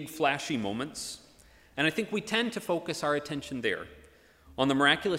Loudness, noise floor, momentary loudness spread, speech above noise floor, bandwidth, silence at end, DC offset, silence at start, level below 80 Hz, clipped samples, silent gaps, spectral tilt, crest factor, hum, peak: -30 LUFS; -58 dBFS; 15 LU; 28 dB; 16 kHz; 0 s; under 0.1%; 0 s; -62 dBFS; under 0.1%; none; -4 dB/octave; 22 dB; none; -8 dBFS